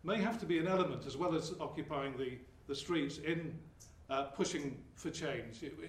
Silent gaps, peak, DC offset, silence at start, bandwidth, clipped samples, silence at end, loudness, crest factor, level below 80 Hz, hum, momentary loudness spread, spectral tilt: none; -22 dBFS; under 0.1%; 0.05 s; 13.5 kHz; under 0.1%; 0 s; -39 LUFS; 18 dB; -64 dBFS; none; 12 LU; -5 dB/octave